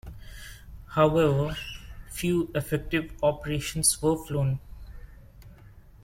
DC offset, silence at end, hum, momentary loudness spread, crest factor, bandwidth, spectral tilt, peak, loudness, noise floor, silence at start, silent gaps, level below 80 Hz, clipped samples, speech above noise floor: under 0.1%; 0.15 s; none; 22 LU; 20 dB; 16.5 kHz; -5 dB/octave; -8 dBFS; -26 LUFS; -50 dBFS; 0.05 s; none; -44 dBFS; under 0.1%; 25 dB